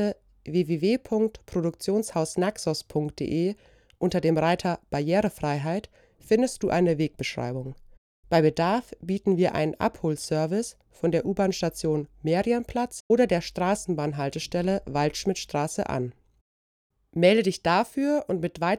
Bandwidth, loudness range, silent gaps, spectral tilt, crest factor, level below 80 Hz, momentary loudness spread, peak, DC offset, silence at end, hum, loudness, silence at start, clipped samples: 15.5 kHz; 2 LU; 7.98-8.23 s, 13.00-13.10 s, 16.41-16.90 s; -6 dB/octave; 20 dB; -54 dBFS; 7 LU; -6 dBFS; under 0.1%; 0 s; none; -26 LUFS; 0 s; under 0.1%